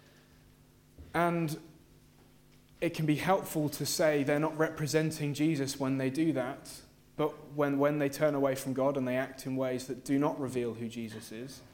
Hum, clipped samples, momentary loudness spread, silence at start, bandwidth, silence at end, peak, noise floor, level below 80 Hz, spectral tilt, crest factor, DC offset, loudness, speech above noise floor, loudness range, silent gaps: none; under 0.1%; 11 LU; 1 s; 17 kHz; 0.1 s; -12 dBFS; -61 dBFS; -64 dBFS; -5.5 dB/octave; 20 dB; under 0.1%; -32 LUFS; 29 dB; 3 LU; none